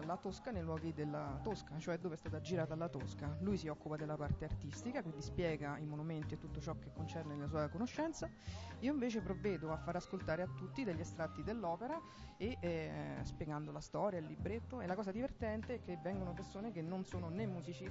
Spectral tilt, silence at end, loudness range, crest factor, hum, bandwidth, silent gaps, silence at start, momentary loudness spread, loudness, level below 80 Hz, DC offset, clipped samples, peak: -6.5 dB/octave; 0 s; 2 LU; 16 dB; none; 7.6 kHz; none; 0 s; 5 LU; -44 LUFS; -58 dBFS; under 0.1%; under 0.1%; -26 dBFS